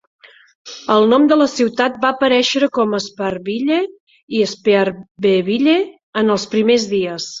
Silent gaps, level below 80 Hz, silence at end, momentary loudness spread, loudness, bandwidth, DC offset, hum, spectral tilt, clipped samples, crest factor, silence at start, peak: 4.00-4.07 s, 4.23-4.28 s, 5.11-5.15 s, 6.03-6.13 s; -60 dBFS; 0 s; 10 LU; -16 LUFS; 7.8 kHz; under 0.1%; none; -4.5 dB/octave; under 0.1%; 14 dB; 0.65 s; -2 dBFS